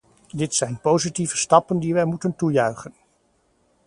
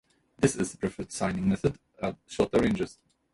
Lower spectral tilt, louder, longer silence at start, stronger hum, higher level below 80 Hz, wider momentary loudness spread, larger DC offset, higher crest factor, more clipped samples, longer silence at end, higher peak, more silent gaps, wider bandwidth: about the same, -4.5 dB/octave vs -5.5 dB/octave; first, -21 LUFS vs -29 LUFS; about the same, 0.35 s vs 0.4 s; neither; second, -58 dBFS vs -52 dBFS; about the same, 12 LU vs 10 LU; neither; about the same, 22 dB vs 20 dB; neither; first, 0.95 s vs 0.4 s; first, 0 dBFS vs -10 dBFS; neither; about the same, 11.5 kHz vs 11.5 kHz